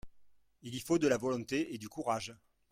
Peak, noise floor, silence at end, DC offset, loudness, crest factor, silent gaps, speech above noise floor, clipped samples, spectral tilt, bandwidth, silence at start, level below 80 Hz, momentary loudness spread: -18 dBFS; -64 dBFS; 0.35 s; under 0.1%; -35 LUFS; 18 dB; none; 29 dB; under 0.1%; -5 dB/octave; 16 kHz; 0.05 s; -66 dBFS; 14 LU